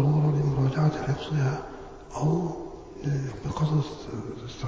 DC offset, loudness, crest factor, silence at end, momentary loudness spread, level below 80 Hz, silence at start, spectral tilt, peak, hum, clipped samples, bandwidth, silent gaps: under 0.1%; -28 LUFS; 14 dB; 0 s; 14 LU; -48 dBFS; 0 s; -8 dB/octave; -12 dBFS; none; under 0.1%; 7.6 kHz; none